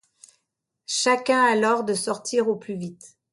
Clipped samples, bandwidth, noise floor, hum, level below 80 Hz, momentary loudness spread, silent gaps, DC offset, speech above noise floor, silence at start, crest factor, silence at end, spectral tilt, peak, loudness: under 0.1%; 11.5 kHz; -79 dBFS; none; -74 dBFS; 14 LU; none; under 0.1%; 56 dB; 0.9 s; 18 dB; 0.25 s; -3 dB/octave; -6 dBFS; -22 LUFS